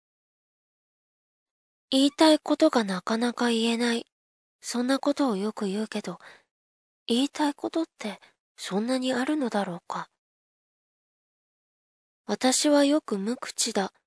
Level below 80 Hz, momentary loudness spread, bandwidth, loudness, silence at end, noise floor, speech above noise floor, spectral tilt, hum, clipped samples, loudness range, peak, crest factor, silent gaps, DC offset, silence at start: -82 dBFS; 16 LU; 11 kHz; -26 LUFS; 0.15 s; under -90 dBFS; over 64 dB; -3.5 dB/octave; none; under 0.1%; 7 LU; -8 dBFS; 20 dB; 4.12-4.59 s, 6.51-7.06 s, 8.40-8.55 s, 10.18-12.24 s; under 0.1%; 1.9 s